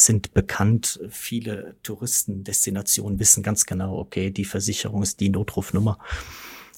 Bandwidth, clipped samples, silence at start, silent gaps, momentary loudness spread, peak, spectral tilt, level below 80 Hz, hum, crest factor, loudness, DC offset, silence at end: 17 kHz; under 0.1%; 0 s; none; 16 LU; -2 dBFS; -3.5 dB/octave; -44 dBFS; none; 22 dB; -22 LUFS; under 0.1%; 0.15 s